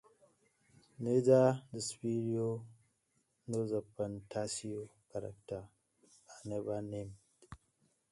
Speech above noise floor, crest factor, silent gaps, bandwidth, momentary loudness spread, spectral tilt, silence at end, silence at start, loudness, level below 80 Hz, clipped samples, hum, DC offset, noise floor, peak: 44 dB; 22 dB; none; 11.5 kHz; 20 LU; -6 dB/octave; 0.55 s; 1 s; -36 LUFS; -70 dBFS; under 0.1%; none; under 0.1%; -79 dBFS; -16 dBFS